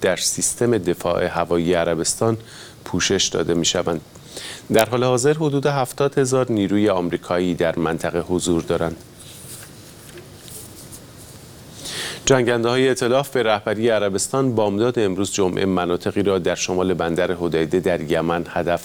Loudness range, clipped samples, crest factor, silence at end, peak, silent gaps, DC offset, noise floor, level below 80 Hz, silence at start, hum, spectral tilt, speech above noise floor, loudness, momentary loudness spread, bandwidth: 6 LU; under 0.1%; 20 dB; 0 s; 0 dBFS; none; under 0.1%; -41 dBFS; -48 dBFS; 0 s; none; -4.5 dB/octave; 21 dB; -20 LUFS; 19 LU; over 20 kHz